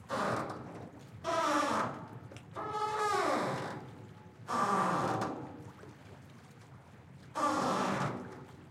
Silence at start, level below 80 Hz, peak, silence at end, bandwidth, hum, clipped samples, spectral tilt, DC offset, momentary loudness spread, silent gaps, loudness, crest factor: 0 s; -72 dBFS; -18 dBFS; 0 s; 16.5 kHz; none; under 0.1%; -5 dB/octave; under 0.1%; 23 LU; none; -34 LUFS; 18 dB